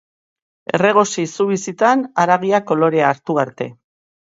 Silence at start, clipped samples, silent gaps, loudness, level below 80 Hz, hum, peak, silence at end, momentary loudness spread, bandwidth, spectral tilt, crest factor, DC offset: 0.75 s; under 0.1%; none; -17 LUFS; -66 dBFS; none; 0 dBFS; 0.6 s; 9 LU; 8 kHz; -5 dB/octave; 18 dB; under 0.1%